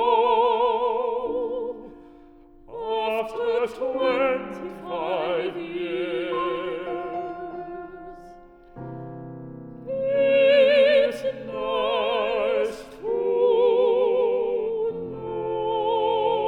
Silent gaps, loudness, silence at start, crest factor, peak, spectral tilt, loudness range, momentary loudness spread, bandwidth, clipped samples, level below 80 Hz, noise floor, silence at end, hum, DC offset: none; -23 LUFS; 0 s; 16 dB; -8 dBFS; -5.5 dB/octave; 10 LU; 18 LU; 10 kHz; under 0.1%; -56 dBFS; -49 dBFS; 0 s; none; under 0.1%